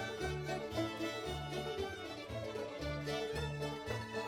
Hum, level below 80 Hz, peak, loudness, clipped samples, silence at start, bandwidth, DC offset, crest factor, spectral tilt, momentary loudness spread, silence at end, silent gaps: none; -56 dBFS; -26 dBFS; -41 LUFS; under 0.1%; 0 s; 18 kHz; under 0.1%; 14 dB; -5 dB/octave; 4 LU; 0 s; none